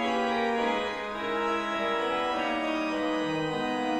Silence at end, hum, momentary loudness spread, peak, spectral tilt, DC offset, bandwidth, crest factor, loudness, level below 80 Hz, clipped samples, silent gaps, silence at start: 0 s; none; 3 LU; -16 dBFS; -4.5 dB/octave; under 0.1%; 12.5 kHz; 12 dB; -29 LUFS; -58 dBFS; under 0.1%; none; 0 s